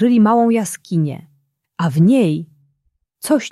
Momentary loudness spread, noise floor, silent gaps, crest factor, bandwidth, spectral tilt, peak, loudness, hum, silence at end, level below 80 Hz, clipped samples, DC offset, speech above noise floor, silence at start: 16 LU; -68 dBFS; none; 14 dB; 14.5 kHz; -7 dB/octave; -4 dBFS; -16 LUFS; none; 0 s; -62 dBFS; under 0.1%; under 0.1%; 53 dB; 0 s